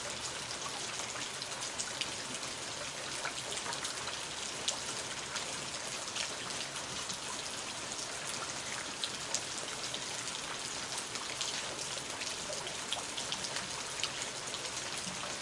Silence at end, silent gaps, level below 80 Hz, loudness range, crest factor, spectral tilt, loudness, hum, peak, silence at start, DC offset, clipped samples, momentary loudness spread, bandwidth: 0 s; none; -68 dBFS; 1 LU; 28 dB; -0.5 dB/octave; -37 LUFS; none; -12 dBFS; 0 s; under 0.1%; under 0.1%; 2 LU; 12 kHz